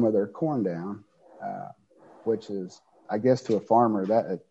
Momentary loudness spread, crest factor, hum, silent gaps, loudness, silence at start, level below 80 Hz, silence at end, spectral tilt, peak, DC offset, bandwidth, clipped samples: 17 LU; 20 dB; none; none; -27 LUFS; 0 s; -72 dBFS; 0.1 s; -8 dB/octave; -8 dBFS; under 0.1%; 8.2 kHz; under 0.1%